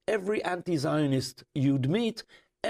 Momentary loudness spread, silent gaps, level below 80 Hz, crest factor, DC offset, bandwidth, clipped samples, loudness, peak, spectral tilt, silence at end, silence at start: 6 LU; none; -64 dBFS; 14 dB; under 0.1%; 15 kHz; under 0.1%; -29 LUFS; -16 dBFS; -6.5 dB/octave; 0 s; 0.1 s